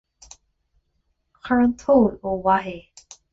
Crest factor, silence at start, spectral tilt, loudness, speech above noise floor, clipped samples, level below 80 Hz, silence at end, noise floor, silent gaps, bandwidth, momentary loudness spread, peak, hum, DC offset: 18 dB; 1.45 s; -6.5 dB/octave; -20 LUFS; 51 dB; under 0.1%; -50 dBFS; 0.5 s; -71 dBFS; none; 7.8 kHz; 19 LU; -4 dBFS; none; under 0.1%